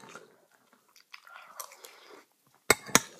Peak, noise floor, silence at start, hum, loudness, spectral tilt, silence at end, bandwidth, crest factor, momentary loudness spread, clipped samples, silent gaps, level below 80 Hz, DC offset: 0 dBFS; -66 dBFS; 1.6 s; none; -25 LUFS; -1.5 dB/octave; 0.15 s; 15.5 kHz; 34 dB; 28 LU; under 0.1%; none; -66 dBFS; under 0.1%